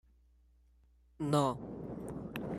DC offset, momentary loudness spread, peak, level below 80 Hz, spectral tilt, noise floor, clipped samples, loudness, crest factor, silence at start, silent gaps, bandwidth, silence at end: under 0.1%; 12 LU; -16 dBFS; -62 dBFS; -6.5 dB/octave; -66 dBFS; under 0.1%; -36 LUFS; 22 dB; 1.2 s; none; 15 kHz; 0 s